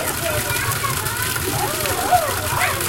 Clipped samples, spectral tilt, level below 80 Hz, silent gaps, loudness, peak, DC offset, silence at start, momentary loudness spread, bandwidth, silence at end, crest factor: under 0.1%; -2.5 dB/octave; -40 dBFS; none; -20 LUFS; -4 dBFS; under 0.1%; 0 s; 3 LU; 17.5 kHz; 0 s; 18 dB